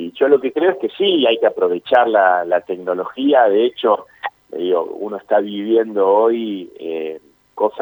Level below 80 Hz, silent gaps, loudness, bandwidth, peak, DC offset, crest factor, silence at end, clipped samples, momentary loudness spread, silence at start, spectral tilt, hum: -70 dBFS; none; -17 LUFS; over 20 kHz; 0 dBFS; under 0.1%; 16 dB; 0 s; under 0.1%; 13 LU; 0 s; -6.5 dB/octave; none